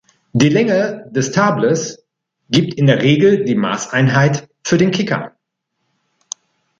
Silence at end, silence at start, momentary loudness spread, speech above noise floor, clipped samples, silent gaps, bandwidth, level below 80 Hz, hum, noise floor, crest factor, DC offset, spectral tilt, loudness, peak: 1.5 s; 0.35 s; 14 LU; 59 dB; under 0.1%; none; 7.8 kHz; -54 dBFS; none; -73 dBFS; 16 dB; under 0.1%; -5.5 dB/octave; -15 LUFS; 0 dBFS